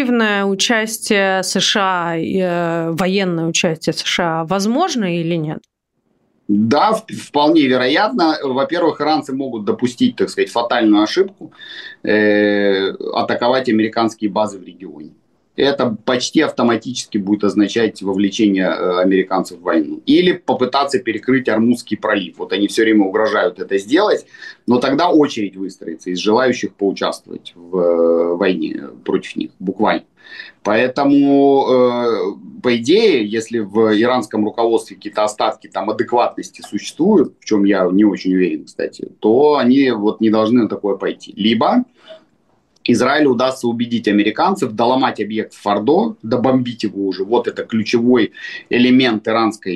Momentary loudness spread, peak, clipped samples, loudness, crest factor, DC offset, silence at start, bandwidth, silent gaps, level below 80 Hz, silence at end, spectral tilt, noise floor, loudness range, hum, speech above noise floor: 10 LU; -4 dBFS; under 0.1%; -16 LUFS; 12 dB; under 0.1%; 0 s; 12.5 kHz; none; -60 dBFS; 0 s; -5 dB/octave; -66 dBFS; 3 LU; none; 50 dB